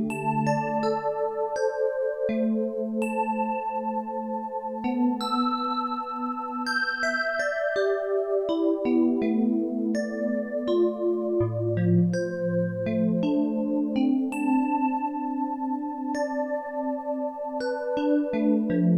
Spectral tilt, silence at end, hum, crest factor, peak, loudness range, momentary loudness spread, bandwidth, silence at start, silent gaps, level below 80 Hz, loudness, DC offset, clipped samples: -7 dB/octave; 0 s; none; 14 dB; -12 dBFS; 3 LU; 6 LU; 14 kHz; 0 s; none; -64 dBFS; -26 LUFS; under 0.1%; under 0.1%